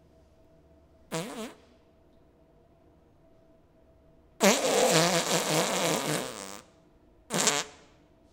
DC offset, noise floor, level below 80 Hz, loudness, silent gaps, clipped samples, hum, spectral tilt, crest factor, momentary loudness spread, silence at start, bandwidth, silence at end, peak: under 0.1%; -61 dBFS; -66 dBFS; -26 LUFS; none; under 0.1%; none; -2.5 dB/octave; 26 dB; 19 LU; 1.1 s; 18 kHz; 0.6 s; -4 dBFS